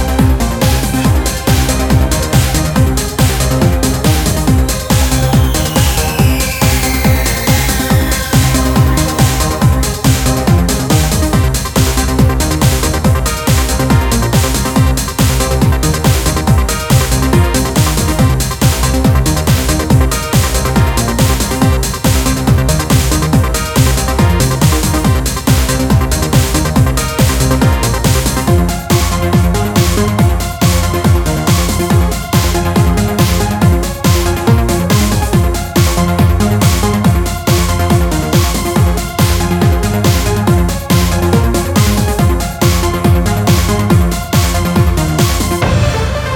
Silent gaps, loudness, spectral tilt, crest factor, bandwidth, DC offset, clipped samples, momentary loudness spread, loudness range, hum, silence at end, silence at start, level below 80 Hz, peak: none; -12 LUFS; -5 dB/octave; 10 dB; 19.5 kHz; under 0.1%; under 0.1%; 2 LU; 1 LU; none; 0 s; 0 s; -16 dBFS; 0 dBFS